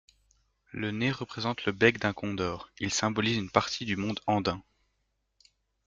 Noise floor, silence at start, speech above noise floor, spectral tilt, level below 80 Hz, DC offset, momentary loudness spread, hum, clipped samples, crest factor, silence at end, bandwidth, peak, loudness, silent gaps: -78 dBFS; 0.75 s; 48 dB; -4.5 dB/octave; -62 dBFS; under 0.1%; 10 LU; none; under 0.1%; 26 dB; 1.25 s; 9.4 kHz; -6 dBFS; -29 LUFS; none